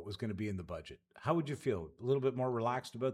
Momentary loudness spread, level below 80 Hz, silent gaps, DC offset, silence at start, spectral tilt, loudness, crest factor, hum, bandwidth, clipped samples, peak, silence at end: 10 LU; -68 dBFS; none; under 0.1%; 0 s; -7 dB/octave; -37 LUFS; 18 dB; none; 14 kHz; under 0.1%; -18 dBFS; 0 s